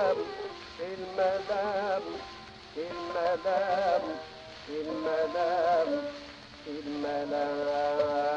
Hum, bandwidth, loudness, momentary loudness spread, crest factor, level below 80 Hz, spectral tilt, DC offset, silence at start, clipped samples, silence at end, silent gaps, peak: none; 8.4 kHz; -31 LUFS; 14 LU; 14 dB; -64 dBFS; -5 dB/octave; under 0.1%; 0 s; under 0.1%; 0 s; none; -16 dBFS